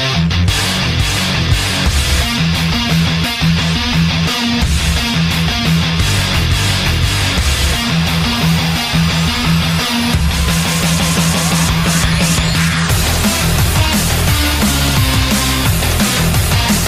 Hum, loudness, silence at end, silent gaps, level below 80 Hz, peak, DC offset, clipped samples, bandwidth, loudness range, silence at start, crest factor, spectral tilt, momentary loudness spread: none; -13 LUFS; 0 s; none; -22 dBFS; -2 dBFS; under 0.1%; under 0.1%; 15.5 kHz; 1 LU; 0 s; 12 dB; -4 dB/octave; 1 LU